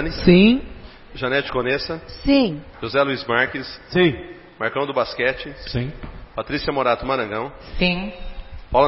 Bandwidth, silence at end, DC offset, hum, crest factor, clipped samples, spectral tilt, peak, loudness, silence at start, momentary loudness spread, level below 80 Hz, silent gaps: 5.8 kHz; 0 s; under 0.1%; none; 20 dB; under 0.1%; -9.5 dB/octave; 0 dBFS; -21 LUFS; 0 s; 16 LU; -36 dBFS; none